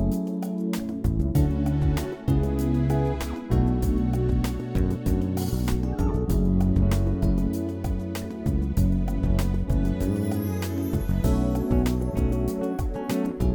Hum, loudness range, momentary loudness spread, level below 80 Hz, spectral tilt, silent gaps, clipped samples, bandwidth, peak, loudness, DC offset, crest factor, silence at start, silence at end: none; 1 LU; 5 LU; -28 dBFS; -8 dB/octave; none; under 0.1%; 19.5 kHz; -8 dBFS; -26 LUFS; under 0.1%; 16 dB; 0 s; 0 s